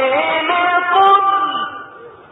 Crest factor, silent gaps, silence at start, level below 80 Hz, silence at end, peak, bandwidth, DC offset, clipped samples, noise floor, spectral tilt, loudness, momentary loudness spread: 12 dB; none; 0 s; -64 dBFS; 0.2 s; -2 dBFS; 4.1 kHz; under 0.1%; under 0.1%; -37 dBFS; -5 dB/octave; -14 LUFS; 13 LU